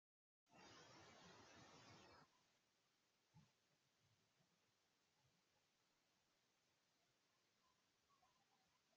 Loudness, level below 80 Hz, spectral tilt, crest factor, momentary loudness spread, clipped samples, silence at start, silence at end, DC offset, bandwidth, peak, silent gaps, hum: -67 LUFS; under -90 dBFS; -2.5 dB/octave; 20 dB; 1 LU; under 0.1%; 0.45 s; 0 s; under 0.1%; 7.4 kHz; -54 dBFS; none; none